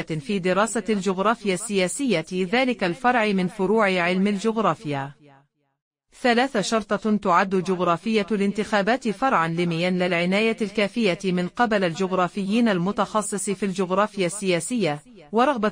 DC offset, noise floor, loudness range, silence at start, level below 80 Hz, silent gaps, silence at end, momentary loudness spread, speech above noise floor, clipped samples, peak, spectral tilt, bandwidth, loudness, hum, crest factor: under 0.1%; -59 dBFS; 2 LU; 0 s; -58 dBFS; 5.82-5.91 s; 0 s; 5 LU; 37 dB; under 0.1%; -6 dBFS; -5 dB/octave; 15.5 kHz; -23 LUFS; none; 18 dB